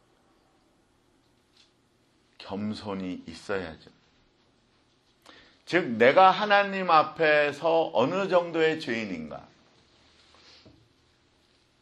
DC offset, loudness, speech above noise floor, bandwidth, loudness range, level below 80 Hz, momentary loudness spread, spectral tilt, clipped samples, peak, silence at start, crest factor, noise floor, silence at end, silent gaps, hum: under 0.1%; -25 LUFS; 42 dB; 10.5 kHz; 16 LU; -68 dBFS; 19 LU; -5.5 dB/octave; under 0.1%; -6 dBFS; 2.4 s; 24 dB; -66 dBFS; 2.4 s; none; none